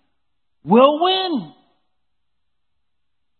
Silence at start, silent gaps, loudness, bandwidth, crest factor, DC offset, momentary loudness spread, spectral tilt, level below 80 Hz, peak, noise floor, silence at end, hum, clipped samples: 0.65 s; none; -16 LUFS; 4.4 kHz; 20 dB; under 0.1%; 11 LU; -10.5 dB/octave; -74 dBFS; 0 dBFS; -80 dBFS; 1.9 s; none; under 0.1%